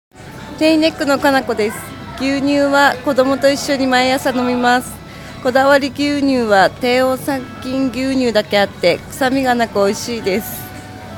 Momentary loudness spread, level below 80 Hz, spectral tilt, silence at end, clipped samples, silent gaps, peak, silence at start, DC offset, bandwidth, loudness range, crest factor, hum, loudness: 12 LU; -46 dBFS; -4 dB/octave; 0 s; under 0.1%; none; 0 dBFS; 0.15 s; under 0.1%; 18 kHz; 2 LU; 16 dB; none; -15 LUFS